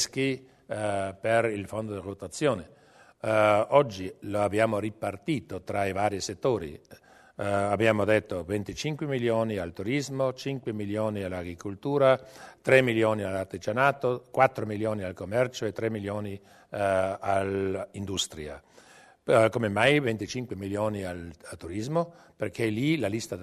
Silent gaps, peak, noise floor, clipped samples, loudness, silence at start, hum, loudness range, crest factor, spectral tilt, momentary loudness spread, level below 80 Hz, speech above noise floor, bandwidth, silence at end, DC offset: none; -6 dBFS; -55 dBFS; under 0.1%; -28 LUFS; 0 s; none; 4 LU; 22 dB; -5.5 dB/octave; 14 LU; -60 dBFS; 27 dB; 13.5 kHz; 0 s; under 0.1%